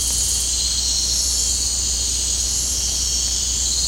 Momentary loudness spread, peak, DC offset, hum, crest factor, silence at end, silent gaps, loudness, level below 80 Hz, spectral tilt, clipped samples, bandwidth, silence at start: 1 LU; -8 dBFS; under 0.1%; none; 14 dB; 0 s; none; -17 LUFS; -30 dBFS; 0 dB/octave; under 0.1%; 16 kHz; 0 s